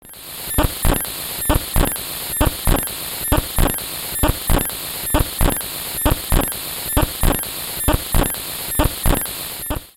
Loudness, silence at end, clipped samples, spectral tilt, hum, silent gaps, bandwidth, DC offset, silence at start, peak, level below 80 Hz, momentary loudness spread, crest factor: -20 LUFS; 0.05 s; under 0.1%; -3.5 dB/octave; none; none; 17 kHz; under 0.1%; 0.05 s; -2 dBFS; -24 dBFS; 5 LU; 18 dB